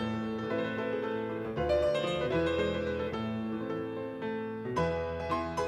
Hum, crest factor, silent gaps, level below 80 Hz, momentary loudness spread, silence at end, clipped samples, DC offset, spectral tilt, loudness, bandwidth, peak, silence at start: none; 14 dB; none; -52 dBFS; 7 LU; 0 s; under 0.1%; under 0.1%; -6.5 dB/octave; -33 LUFS; 12 kHz; -18 dBFS; 0 s